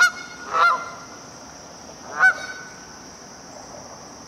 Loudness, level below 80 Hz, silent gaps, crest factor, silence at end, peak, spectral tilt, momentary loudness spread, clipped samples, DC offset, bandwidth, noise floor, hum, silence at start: -20 LUFS; -60 dBFS; none; 22 dB; 0 s; -4 dBFS; -1 dB/octave; 22 LU; under 0.1%; under 0.1%; 15 kHz; -41 dBFS; none; 0 s